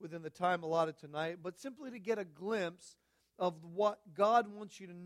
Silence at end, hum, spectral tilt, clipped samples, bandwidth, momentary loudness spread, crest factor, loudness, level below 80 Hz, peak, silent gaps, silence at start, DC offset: 0 s; none; -5.5 dB/octave; under 0.1%; 13.5 kHz; 16 LU; 20 dB; -37 LUFS; -82 dBFS; -16 dBFS; none; 0 s; under 0.1%